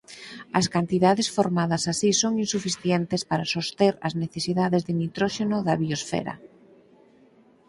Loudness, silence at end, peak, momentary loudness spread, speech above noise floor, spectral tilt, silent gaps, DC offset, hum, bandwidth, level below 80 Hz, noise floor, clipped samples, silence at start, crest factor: -24 LUFS; 1.25 s; -6 dBFS; 8 LU; 32 dB; -4.5 dB/octave; none; under 0.1%; none; 11.5 kHz; -60 dBFS; -57 dBFS; under 0.1%; 0.1 s; 20 dB